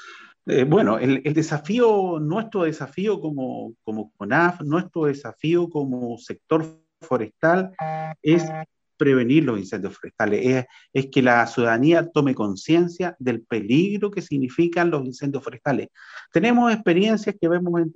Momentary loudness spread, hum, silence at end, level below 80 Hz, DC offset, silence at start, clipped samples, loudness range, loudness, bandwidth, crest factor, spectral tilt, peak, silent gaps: 12 LU; none; 0.05 s; -66 dBFS; under 0.1%; 0 s; under 0.1%; 4 LU; -22 LUFS; 7.8 kHz; 18 dB; -7 dB/octave; -4 dBFS; none